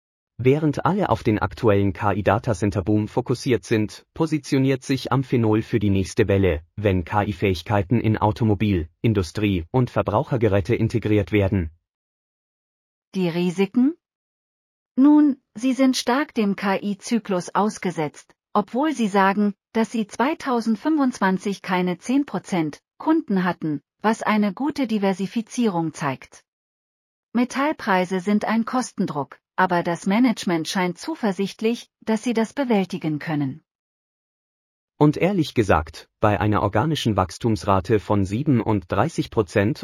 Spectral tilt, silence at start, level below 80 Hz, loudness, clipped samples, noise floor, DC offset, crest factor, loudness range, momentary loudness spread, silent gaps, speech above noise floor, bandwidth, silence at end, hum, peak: -6.5 dB/octave; 0.4 s; -46 dBFS; -22 LUFS; under 0.1%; under -90 dBFS; under 0.1%; 18 dB; 4 LU; 6 LU; 11.89-13.12 s, 14.15-14.95 s, 26.48-27.32 s, 33.75-34.88 s; over 69 dB; 15 kHz; 0 s; none; -4 dBFS